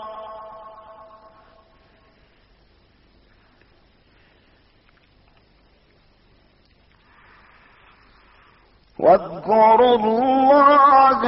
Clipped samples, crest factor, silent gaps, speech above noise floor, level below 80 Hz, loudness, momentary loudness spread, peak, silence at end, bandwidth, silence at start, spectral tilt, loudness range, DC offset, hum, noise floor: under 0.1%; 18 dB; none; 43 dB; -56 dBFS; -15 LUFS; 26 LU; -4 dBFS; 0 s; 5.8 kHz; 0 s; -3 dB/octave; 21 LU; under 0.1%; 50 Hz at -65 dBFS; -57 dBFS